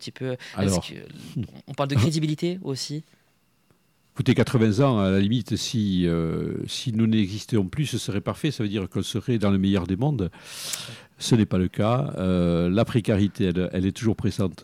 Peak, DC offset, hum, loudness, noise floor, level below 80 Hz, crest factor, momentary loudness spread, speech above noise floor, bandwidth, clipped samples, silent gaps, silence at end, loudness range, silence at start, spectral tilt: -8 dBFS; under 0.1%; none; -24 LUFS; -65 dBFS; -50 dBFS; 16 dB; 11 LU; 42 dB; 16 kHz; under 0.1%; none; 0 s; 4 LU; 0 s; -6 dB/octave